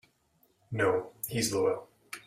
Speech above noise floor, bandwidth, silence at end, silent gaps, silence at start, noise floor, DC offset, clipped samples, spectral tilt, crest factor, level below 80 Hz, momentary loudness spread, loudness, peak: 40 dB; 16 kHz; 0.1 s; none; 0.7 s; -70 dBFS; under 0.1%; under 0.1%; -4 dB/octave; 20 dB; -66 dBFS; 11 LU; -31 LUFS; -14 dBFS